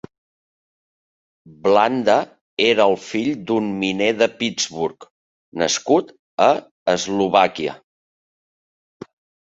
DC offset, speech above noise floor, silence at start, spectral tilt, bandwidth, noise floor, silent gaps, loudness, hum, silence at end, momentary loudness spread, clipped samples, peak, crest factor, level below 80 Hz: under 0.1%; over 72 dB; 1.65 s; -3.5 dB/octave; 8 kHz; under -90 dBFS; 2.41-2.57 s, 5.11-5.52 s, 6.19-6.37 s, 6.71-6.86 s; -19 LUFS; none; 1.8 s; 10 LU; under 0.1%; -2 dBFS; 20 dB; -62 dBFS